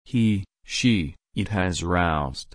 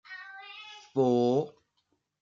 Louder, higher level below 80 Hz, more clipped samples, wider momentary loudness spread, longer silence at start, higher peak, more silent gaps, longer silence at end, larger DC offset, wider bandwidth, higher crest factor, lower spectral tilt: first, -24 LUFS vs -28 LUFS; first, -40 dBFS vs -80 dBFS; neither; second, 8 LU vs 19 LU; about the same, 0.1 s vs 0.1 s; first, -8 dBFS vs -14 dBFS; neither; second, 0.1 s vs 0.7 s; neither; first, 10.5 kHz vs 7.4 kHz; about the same, 16 dB vs 18 dB; second, -5.5 dB/octave vs -7 dB/octave